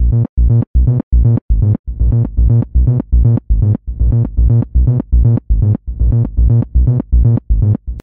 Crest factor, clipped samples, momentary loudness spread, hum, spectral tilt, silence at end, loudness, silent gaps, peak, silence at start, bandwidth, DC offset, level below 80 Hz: 8 dB; under 0.1%; 3 LU; none; -14 dB/octave; 0 s; -14 LUFS; 0.29-0.37 s, 0.67-0.74 s, 1.03-1.11 s, 1.41-1.49 s, 1.79-1.84 s; -2 dBFS; 0 s; 1.6 kHz; 0.4%; -14 dBFS